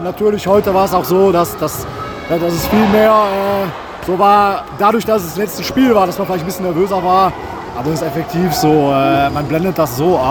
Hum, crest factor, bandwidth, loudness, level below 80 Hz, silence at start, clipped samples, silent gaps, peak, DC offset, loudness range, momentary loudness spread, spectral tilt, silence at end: none; 14 dB; over 20 kHz; -14 LUFS; -40 dBFS; 0 s; under 0.1%; none; 0 dBFS; under 0.1%; 2 LU; 10 LU; -6 dB/octave; 0 s